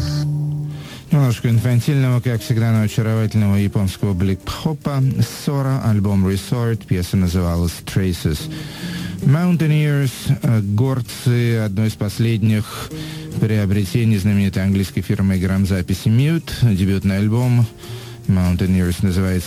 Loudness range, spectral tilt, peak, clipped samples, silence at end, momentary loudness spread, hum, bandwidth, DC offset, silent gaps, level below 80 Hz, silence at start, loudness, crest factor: 2 LU; -7 dB/octave; -4 dBFS; under 0.1%; 0 s; 7 LU; none; 16 kHz; under 0.1%; none; -38 dBFS; 0 s; -18 LUFS; 14 dB